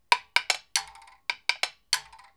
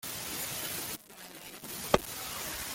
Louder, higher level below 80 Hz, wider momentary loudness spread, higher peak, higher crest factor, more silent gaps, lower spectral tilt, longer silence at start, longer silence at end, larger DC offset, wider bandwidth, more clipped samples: first, -28 LUFS vs -35 LUFS; second, -70 dBFS vs -56 dBFS; second, 11 LU vs 14 LU; first, 0 dBFS vs -8 dBFS; about the same, 30 dB vs 28 dB; neither; second, 3.5 dB/octave vs -2.5 dB/octave; about the same, 0.1 s vs 0 s; first, 0.35 s vs 0 s; neither; first, 19.5 kHz vs 17 kHz; neither